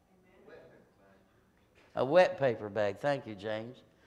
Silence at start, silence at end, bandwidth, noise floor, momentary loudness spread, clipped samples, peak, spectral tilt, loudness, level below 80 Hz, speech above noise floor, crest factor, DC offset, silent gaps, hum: 0.5 s; 0.35 s; 9.4 kHz; -67 dBFS; 15 LU; under 0.1%; -12 dBFS; -6.5 dB/octave; -31 LUFS; -72 dBFS; 37 dB; 22 dB; under 0.1%; none; none